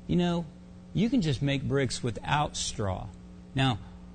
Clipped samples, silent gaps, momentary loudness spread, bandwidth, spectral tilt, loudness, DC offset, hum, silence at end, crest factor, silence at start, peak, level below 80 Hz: under 0.1%; none; 13 LU; 9.4 kHz; -5.5 dB/octave; -30 LUFS; under 0.1%; none; 0 s; 16 dB; 0 s; -14 dBFS; -48 dBFS